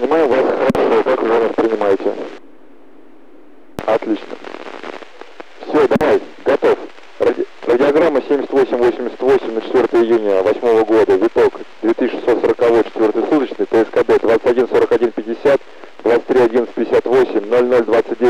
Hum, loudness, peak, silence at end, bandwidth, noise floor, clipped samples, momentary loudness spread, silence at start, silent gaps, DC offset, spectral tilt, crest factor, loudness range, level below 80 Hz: none; -15 LUFS; -6 dBFS; 0 s; 10.5 kHz; -45 dBFS; under 0.1%; 9 LU; 0 s; none; 1%; -6.5 dB/octave; 10 dB; 6 LU; -50 dBFS